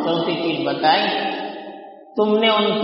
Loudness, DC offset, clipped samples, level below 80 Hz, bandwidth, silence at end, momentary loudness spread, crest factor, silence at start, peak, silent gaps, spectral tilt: -19 LUFS; under 0.1%; under 0.1%; -68 dBFS; 5.8 kHz; 0 s; 17 LU; 16 dB; 0 s; -4 dBFS; none; -2 dB/octave